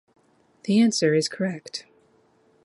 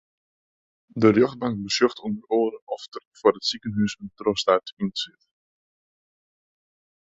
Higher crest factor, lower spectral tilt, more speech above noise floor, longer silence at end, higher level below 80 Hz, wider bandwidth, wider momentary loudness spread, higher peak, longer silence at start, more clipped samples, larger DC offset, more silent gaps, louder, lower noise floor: about the same, 18 dB vs 22 dB; about the same, -5 dB/octave vs -5 dB/octave; second, 39 dB vs over 67 dB; second, 0.85 s vs 2.05 s; second, -72 dBFS vs -62 dBFS; first, 11.5 kHz vs 8 kHz; about the same, 17 LU vs 15 LU; second, -8 dBFS vs -4 dBFS; second, 0.65 s vs 0.95 s; neither; neither; second, none vs 2.62-2.67 s, 3.05-3.11 s, 4.73-4.77 s; about the same, -23 LUFS vs -24 LUFS; second, -61 dBFS vs under -90 dBFS